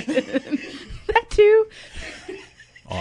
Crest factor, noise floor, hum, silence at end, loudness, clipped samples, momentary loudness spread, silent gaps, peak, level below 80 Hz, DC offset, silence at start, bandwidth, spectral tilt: 20 dB; -47 dBFS; none; 0 s; -20 LUFS; under 0.1%; 21 LU; none; -2 dBFS; -42 dBFS; under 0.1%; 0 s; 10 kHz; -5 dB/octave